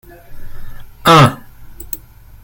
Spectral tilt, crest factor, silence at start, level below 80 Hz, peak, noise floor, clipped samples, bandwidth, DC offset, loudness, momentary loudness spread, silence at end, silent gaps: -5.5 dB/octave; 16 dB; 0.3 s; -34 dBFS; 0 dBFS; -33 dBFS; under 0.1%; 17.5 kHz; under 0.1%; -10 LUFS; 19 LU; 0.45 s; none